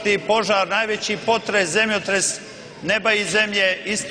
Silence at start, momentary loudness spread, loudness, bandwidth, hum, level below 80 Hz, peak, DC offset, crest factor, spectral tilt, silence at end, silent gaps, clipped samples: 0 s; 5 LU; -19 LUFS; 10.5 kHz; none; -58 dBFS; -6 dBFS; under 0.1%; 16 dB; -2 dB/octave; 0 s; none; under 0.1%